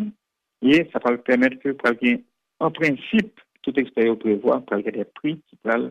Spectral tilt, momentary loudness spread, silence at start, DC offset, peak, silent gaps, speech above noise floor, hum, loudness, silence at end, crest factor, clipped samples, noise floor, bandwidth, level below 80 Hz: -6.5 dB/octave; 10 LU; 0 s; under 0.1%; -8 dBFS; none; 43 dB; none; -22 LUFS; 0 s; 14 dB; under 0.1%; -64 dBFS; 8.8 kHz; -62 dBFS